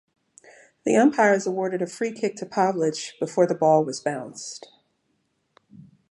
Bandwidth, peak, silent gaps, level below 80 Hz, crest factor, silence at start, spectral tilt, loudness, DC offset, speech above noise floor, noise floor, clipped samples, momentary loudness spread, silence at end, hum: 11.5 kHz; -6 dBFS; none; -74 dBFS; 20 dB; 0.85 s; -5 dB/octave; -23 LUFS; under 0.1%; 49 dB; -72 dBFS; under 0.1%; 14 LU; 1.55 s; none